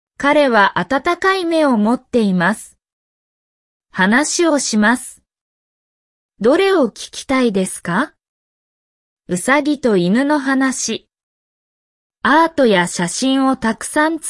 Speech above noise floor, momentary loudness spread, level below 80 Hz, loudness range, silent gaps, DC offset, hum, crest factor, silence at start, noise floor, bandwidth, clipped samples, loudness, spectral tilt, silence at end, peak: over 75 dB; 8 LU; -54 dBFS; 2 LU; 2.93-3.80 s, 5.41-6.29 s, 8.29-9.17 s, 11.23-12.10 s; under 0.1%; none; 14 dB; 0.2 s; under -90 dBFS; 12 kHz; under 0.1%; -15 LUFS; -4 dB/octave; 0 s; -2 dBFS